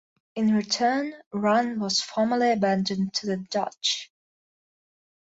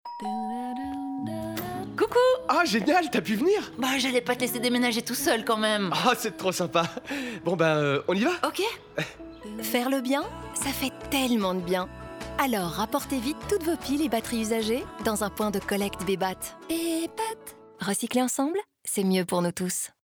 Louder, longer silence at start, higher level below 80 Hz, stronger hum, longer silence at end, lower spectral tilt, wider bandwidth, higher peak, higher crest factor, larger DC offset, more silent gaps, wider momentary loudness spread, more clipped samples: about the same, -25 LUFS vs -27 LUFS; first, 0.35 s vs 0.05 s; second, -70 dBFS vs -54 dBFS; neither; first, 1.35 s vs 0.15 s; about the same, -4 dB/octave vs -4 dB/octave; second, 8 kHz vs over 20 kHz; about the same, -10 dBFS vs -10 dBFS; about the same, 16 dB vs 18 dB; neither; first, 1.26-1.31 s vs none; second, 7 LU vs 10 LU; neither